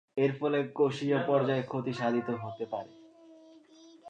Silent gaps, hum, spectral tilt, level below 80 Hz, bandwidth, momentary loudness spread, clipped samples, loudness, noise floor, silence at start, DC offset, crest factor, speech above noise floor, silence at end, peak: none; none; -7.5 dB/octave; -78 dBFS; 8.8 kHz; 10 LU; under 0.1%; -31 LUFS; -56 dBFS; 0.15 s; under 0.1%; 18 dB; 26 dB; 0 s; -14 dBFS